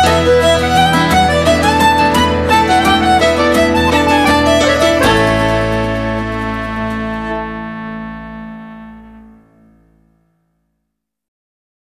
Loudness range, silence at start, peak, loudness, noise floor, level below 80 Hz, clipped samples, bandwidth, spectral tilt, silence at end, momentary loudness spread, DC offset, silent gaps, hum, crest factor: 16 LU; 0 s; 0 dBFS; -12 LUFS; -74 dBFS; -28 dBFS; under 0.1%; 16 kHz; -4.5 dB/octave; 2.6 s; 15 LU; under 0.1%; none; none; 14 dB